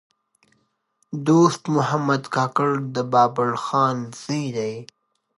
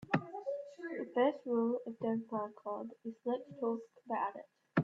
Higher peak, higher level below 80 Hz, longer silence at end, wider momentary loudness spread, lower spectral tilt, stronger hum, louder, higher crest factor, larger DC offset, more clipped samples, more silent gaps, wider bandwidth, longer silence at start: first, -4 dBFS vs -16 dBFS; first, -70 dBFS vs -78 dBFS; first, 0.55 s vs 0 s; about the same, 11 LU vs 10 LU; second, -6 dB/octave vs -8.5 dB/octave; neither; first, -21 LUFS vs -38 LUFS; about the same, 20 dB vs 22 dB; neither; neither; neither; first, 11.5 kHz vs 7.2 kHz; first, 1.1 s vs 0 s